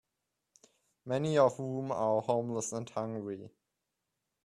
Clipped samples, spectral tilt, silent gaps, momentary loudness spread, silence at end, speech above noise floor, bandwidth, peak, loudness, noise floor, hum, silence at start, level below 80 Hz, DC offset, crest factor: under 0.1%; -6 dB/octave; none; 13 LU; 0.95 s; 54 dB; 13 kHz; -14 dBFS; -33 LUFS; -86 dBFS; none; 1.05 s; -76 dBFS; under 0.1%; 22 dB